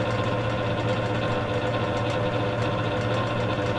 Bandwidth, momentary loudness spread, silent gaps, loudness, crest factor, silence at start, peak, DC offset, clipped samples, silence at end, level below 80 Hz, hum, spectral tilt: 10.5 kHz; 1 LU; none; -26 LUFS; 12 dB; 0 s; -12 dBFS; under 0.1%; under 0.1%; 0 s; -46 dBFS; none; -6.5 dB/octave